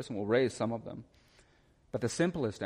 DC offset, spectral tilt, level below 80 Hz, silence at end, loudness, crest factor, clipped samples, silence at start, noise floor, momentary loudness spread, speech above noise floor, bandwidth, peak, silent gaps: under 0.1%; -5.5 dB/octave; -64 dBFS; 0 s; -33 LUFS; 18 dB; under 0.1%; 0 s; -66 dBFS; 14 LU; 33 dB; 15 kHz; -16 dBFS; none